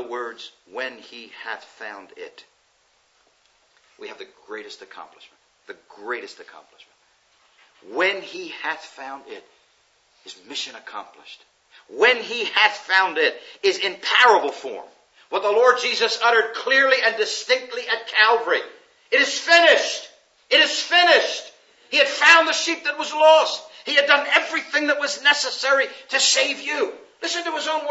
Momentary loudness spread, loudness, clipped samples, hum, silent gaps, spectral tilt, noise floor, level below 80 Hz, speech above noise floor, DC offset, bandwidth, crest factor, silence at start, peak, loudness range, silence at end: 22 LU; -18 LUFS; under 0.1%; none; none; 0.5 dB/octave; -63 dBFS; -84 dBFS; 42 dB; under 0.1%; 8.2 kHz; 22 dB; 0 s; 0 dBFS; 20 LU; 0 s